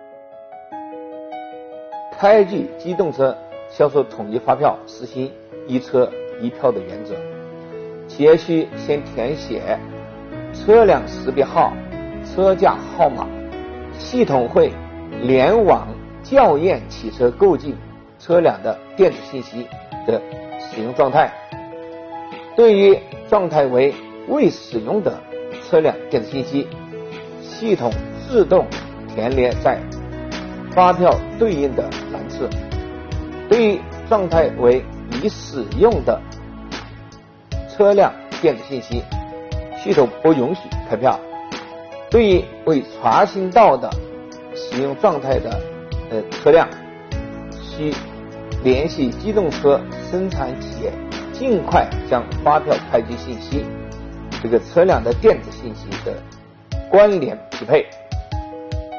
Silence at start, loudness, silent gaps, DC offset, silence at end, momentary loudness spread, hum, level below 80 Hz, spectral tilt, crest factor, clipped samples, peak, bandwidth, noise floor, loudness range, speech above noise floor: 0 s; -18 LUFS; none; under 0.1%; 0 s; 19 LU; none; -36 dBFS; -5.5 dB/octave; 18 dB; under 0.1%; -2 dBFS; 6.8 kHz; -41 dBFS; 4 LU; 25 dB